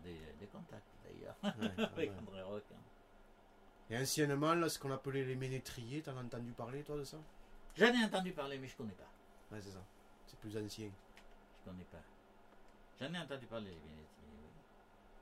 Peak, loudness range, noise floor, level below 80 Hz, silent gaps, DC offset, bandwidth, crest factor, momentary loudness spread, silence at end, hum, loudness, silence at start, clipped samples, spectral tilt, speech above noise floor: -16 dBFS; 13 LU; -64 dBFS; -64 dBFS; none; under 0.1%; 16 kHz; 28 dB; 25 LU; 0 s; none; -41 LUFS; 0 s; under 0.1%; -4.5 dB/octave; 23 dB